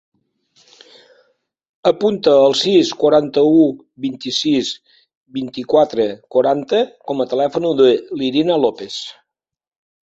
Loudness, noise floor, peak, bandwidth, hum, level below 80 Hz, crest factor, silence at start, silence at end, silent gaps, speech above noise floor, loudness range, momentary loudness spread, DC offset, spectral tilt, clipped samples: -16 LUFS; -67 dBFS; 0 dBFS; 8.2 kHz; none; -60 dBFS; 16 dB; 1.85 s; 0.95 s; 5.17-5.24 s; 52 dB; 4 LU; 14 LU; under 0.1%; -5 dB/octave; under 0.1%